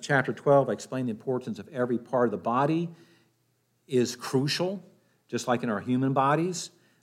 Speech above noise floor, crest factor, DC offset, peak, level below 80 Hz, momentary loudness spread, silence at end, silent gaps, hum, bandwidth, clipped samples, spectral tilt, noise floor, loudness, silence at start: 45 dB; 18 dB; under 0.1%; -10 dBFS; -78 dBFS; 11 LU; 0.35 s; none; none; 15 kHz; under 0.1%; -5.5 dB/octave; -71 dBFS; -28 LUFS; 0 s